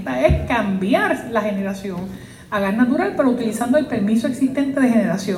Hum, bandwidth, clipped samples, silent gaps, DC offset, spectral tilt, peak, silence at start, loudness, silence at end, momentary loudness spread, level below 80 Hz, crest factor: none; 15.5 kHz; under 0.1%; none; under 0.1%; -6.5 dB/octave; -2 dBFS; 0 s; -19 LUFS; 0 s; 9 LU; -36 dBFS; 16 dB